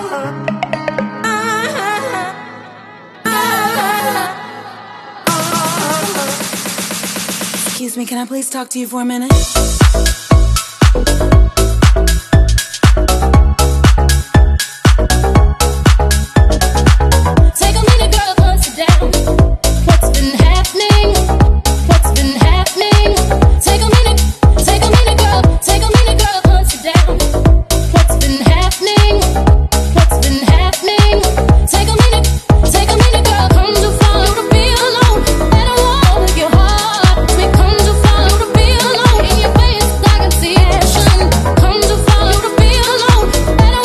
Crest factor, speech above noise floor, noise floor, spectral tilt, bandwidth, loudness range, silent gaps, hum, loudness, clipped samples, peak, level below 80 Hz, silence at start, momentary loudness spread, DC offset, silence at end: 10 dB; 20 dB; -35 dBFS; -4.5 dB/octave; 14 kHz; 7 LU; none; none; -11 LUFS; 0.3%; 0 dBFS; -12 dBFS; 0 s; 8 LU; under 0.1%; 0 s